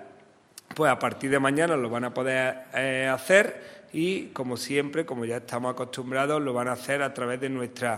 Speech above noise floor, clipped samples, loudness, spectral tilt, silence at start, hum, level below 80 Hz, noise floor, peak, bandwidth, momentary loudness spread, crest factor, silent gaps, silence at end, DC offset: 28 dB; under 0.1%; -27 LUFS; -4.5 dB/octave; 0 s; none; -72 dBFS; -54 dBFS; -4 dBFS; 16 kHz; 10 LU; 22 dB; none; 0 s; under 0.1%